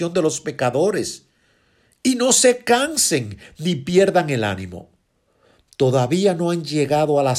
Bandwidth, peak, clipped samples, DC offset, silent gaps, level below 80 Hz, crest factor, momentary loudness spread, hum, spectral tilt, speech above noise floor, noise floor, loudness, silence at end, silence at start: 15.5 kHz; -4 dBFS; under 0.1%; under 0.1%; none; -58 dBFS; 16 dB; 12 LU; none; -4 dB/octave; 45 dB; -63 dBFS; -19 LUFS; 0 s; 0 s